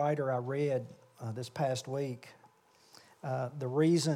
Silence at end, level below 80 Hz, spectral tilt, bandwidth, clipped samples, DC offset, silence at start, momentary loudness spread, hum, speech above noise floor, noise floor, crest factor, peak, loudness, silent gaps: 0 s; -82 dBFS; -6 dB/octave; 15.5 kHz; under 0.1%; under 0.1%; 0 s; 16 LU; none; 31 dB; -64 dBFS; 16 dB; -18 dBFS; -34 LUFS; none